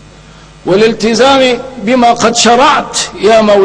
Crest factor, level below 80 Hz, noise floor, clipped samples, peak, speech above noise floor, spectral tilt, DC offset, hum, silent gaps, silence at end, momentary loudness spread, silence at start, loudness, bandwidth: 8 dB; -40 dBFS; -35 dBFS; 0.5%; 0 dBFS; 27 dB; -3 dB/octave; under 0.1%; none; none; 0 s; 7 LU; 0.65 s; -8 LUFS; 11 kHz